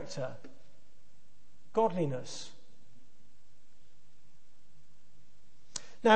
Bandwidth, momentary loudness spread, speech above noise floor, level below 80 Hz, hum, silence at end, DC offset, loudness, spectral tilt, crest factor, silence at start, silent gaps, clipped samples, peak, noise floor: 8.4 kHz; 20 LU; 35 dB; -74 dBFS; none; 0 s; 1%; -35 LUFS; -4.5 dB/octave; 26 dB; 0 s; none; under 0.1%; -10 dBFS; -69 dBFS